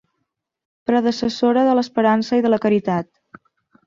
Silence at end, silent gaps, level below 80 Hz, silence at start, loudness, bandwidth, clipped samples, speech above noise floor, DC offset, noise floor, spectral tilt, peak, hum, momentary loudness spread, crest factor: 0.85 s; none; -58 dBFS; 0.9 s; -18 LUFS; 7.4 kHz; under 0.1%; 59 dB; under 0.1%; -76 dBFS; -6.5 dB/octave; -4 dBFS; none; 8 LU; 16 dB